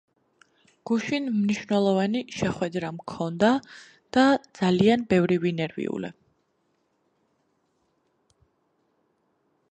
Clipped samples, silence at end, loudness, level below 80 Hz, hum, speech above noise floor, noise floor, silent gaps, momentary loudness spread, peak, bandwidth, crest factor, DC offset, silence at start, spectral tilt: under 0.1%; 3.6 s; -25 LUFS; -62 dBFS; none; 48 dB; -72 dBFS; none; 11 LU; -6 dBFS; 9 kHz; 20 dB; under 0.1%; 0.85 s; -6.5 dB/octave